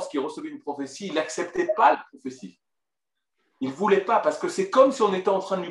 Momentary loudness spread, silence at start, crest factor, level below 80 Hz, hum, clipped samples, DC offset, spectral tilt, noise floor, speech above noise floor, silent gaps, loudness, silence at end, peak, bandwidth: 15 LU; 0 s; 20 dB; -74 dBFS; none; under 0.1%; under 0.1%; -4.5 dB/octave; -88 dBFS; 64 dB; none; -24 LUFS; 0 s; -4 dBFS; 11.5 kHz